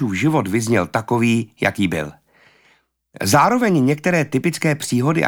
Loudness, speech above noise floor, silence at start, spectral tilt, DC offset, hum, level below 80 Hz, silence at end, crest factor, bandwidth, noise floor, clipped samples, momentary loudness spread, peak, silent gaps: -18 LUFS; 41 dB; 0 s; -5.5 dB/octave; under 0.1%; none; -54 dBFS; 0 s; 18 dB; 19.5 kHz; -59 dBFS; under 0.1%; 6 LU; -2 dBFS; none